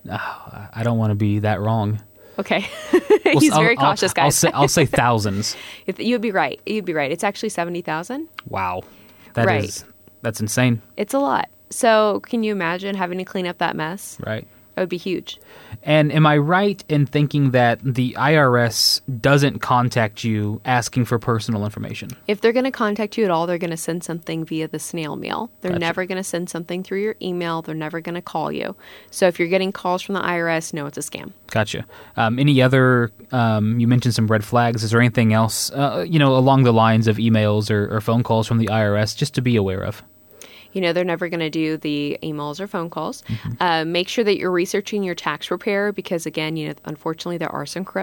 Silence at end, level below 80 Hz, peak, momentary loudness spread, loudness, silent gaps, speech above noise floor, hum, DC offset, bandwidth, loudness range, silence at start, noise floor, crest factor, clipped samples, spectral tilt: 0 s; -54 dBFS; -4 dBFS; 13 LU; -20 LUFS; none; 25 dB; none; under 0.1%; 18 kHz; 8 LU; 0.05 s; -44 dBFS; 16 dB; under 0.1%; -5.5 dB/octave